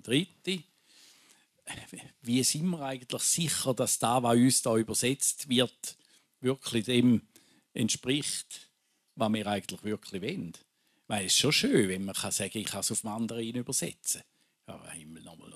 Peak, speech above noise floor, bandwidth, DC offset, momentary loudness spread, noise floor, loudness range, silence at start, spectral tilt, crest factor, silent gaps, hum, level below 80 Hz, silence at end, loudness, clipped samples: -10 dBFS; 34 dB; 15 kHz; under 0.1%; 19 LU; -64 dBFS; 6 LU; 0.05 s; -3.5 dB/octave; 20 dB; none; none; -70 dBFS; 0 s; -29 LUFS; under 0.1%